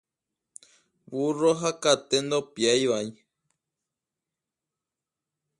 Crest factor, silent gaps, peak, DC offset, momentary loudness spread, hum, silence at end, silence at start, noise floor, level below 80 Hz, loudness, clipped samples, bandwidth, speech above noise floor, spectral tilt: 22 dB; none; -6 dBFS; under 0.1%; 8 LU; none; 2.45 s; 1.1 s; -89 dBFS; -72 dBFS; -25 LUFS; under 0.1%; 11.5 kHz; 64 dB; -3.5 dB/octave